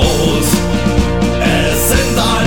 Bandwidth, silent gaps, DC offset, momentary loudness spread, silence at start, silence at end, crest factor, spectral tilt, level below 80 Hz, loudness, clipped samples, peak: 19.5 kHz; none; 5%; 2 LU; 0 s; 0 s; 10 dB; -4.5 dB/octave; -20 dBFS; -13 LUFS; under 0.1%; -2 dBFS